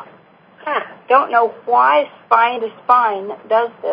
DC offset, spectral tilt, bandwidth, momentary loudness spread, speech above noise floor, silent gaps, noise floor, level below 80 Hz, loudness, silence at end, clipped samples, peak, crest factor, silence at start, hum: under 0.1%; -5.5 dB/octave; 5.2 kHz; 10 LU; 32 dB; none; -47 dBFS; -72 dBFS; -16 LUFS; 0 s; under 0.1%; 0 dBFS; 16 dB; 0 s; none